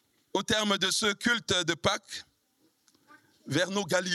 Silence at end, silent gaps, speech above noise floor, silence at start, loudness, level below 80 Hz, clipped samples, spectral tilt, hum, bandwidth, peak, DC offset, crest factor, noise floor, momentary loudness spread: 0 s; none; 42 dB; 0.35 s; -28 LUFS; -64 dBFS; under 0.1%; -2.5 dB/octave; none; 14.5 kHz; -12 dBFS; under 0.1%; 20 dB; -71 dBFS; 9 LU